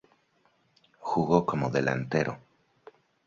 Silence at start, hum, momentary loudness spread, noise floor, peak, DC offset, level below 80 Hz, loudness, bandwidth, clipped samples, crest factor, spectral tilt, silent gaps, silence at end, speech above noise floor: 1 s; none; 11 LU; -68 dBFS; -8 dBFS; under 0.1%; -60 dBFS; -28 LUFS; 7.6 kHz; under 0.1%; 24 dB; -7 dB/octave; none; 0.9 s; 42 dB